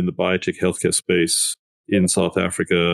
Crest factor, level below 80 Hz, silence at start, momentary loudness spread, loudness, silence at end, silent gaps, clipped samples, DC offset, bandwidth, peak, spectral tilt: 16 dB; -52 dBFS; 0 s; 5 LU; -19 LUFS; 0 s; 1.59-1.84 s; under 0.1%; under 0.1%; 13 kHz; -4 dBFS; -4 dB/octave